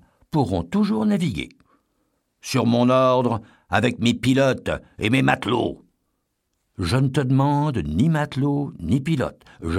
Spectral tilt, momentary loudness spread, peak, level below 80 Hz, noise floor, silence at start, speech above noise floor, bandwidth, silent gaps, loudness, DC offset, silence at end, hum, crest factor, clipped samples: -6.5 dB/octave; 10 LU; -4 dBFS; -46 dBFS; -74 dBFS; 0.35 s; 53 dB; 14 kHz; none; -21 LUFS; under 0.1%; 0 s; none; 18 dB; under 0.1%